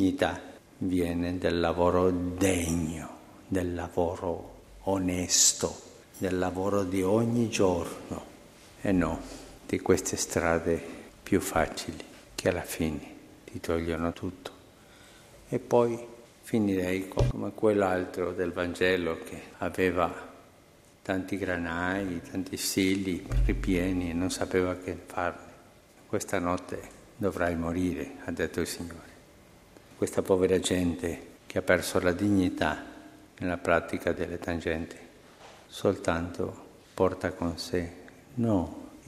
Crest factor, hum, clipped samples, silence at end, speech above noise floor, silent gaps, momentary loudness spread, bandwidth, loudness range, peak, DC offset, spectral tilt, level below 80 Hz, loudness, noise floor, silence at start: 24 dB; none; under 0.1%; 0.05 s; 29 dB; none; 16 LU; 15.5 kHz; 5 LU; -6 dBFS; under 0.1%; -4.5 dB/octave; -46 dBFS; -29 LUFS; -57 dBFS; 0 s